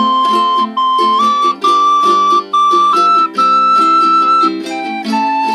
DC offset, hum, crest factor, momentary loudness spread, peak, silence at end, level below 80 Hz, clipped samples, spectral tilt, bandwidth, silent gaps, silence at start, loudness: under 0.1%; none; 10 dB; 6 LU; 0 dBFS; 0 s; -70 dBFS; under 0.1%; -3 dB/octave; 13.5 kHz; none; 0 s; -10 LUFS